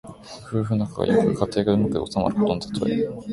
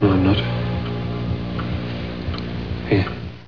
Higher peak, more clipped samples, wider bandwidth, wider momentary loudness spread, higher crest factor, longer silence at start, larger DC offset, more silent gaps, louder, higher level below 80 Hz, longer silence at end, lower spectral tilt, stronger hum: about the same, -4 dBFS vs -4 dBFS; neither; first, 11.5 kHz vs 5.4 kHz; about the same, 8 LU vs 9 LU; about the same, 18 dB vs 18 dB; about the same, 0.05 s vs 0 s; second, under 0.1% vs 0.9%; neither; about the same, -23 LUFS vs -23 LUFS; second, -48 dBFS vs -36 dBFS; about the same, 0 s vs 0 s; second, -7.5 dB/octave vs -9 dB/octave; second, none vs 60 Hz at -40 dBFS